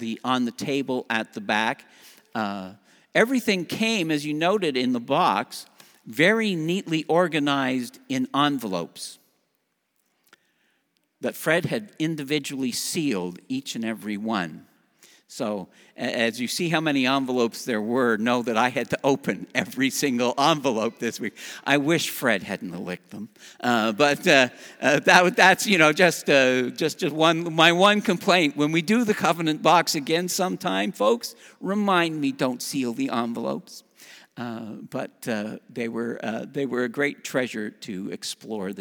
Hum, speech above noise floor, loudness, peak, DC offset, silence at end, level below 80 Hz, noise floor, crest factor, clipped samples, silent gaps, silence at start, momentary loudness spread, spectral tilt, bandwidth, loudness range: none; 50 dB; -23 LUFS; 0 dBFS; under 0.1%; 0 s; -74 dBFS; -74 dBFS; 24 dB; under 0.1%; none; 0 s; 15 LU; -4 dB/octave; over 20 kHz; 11 LU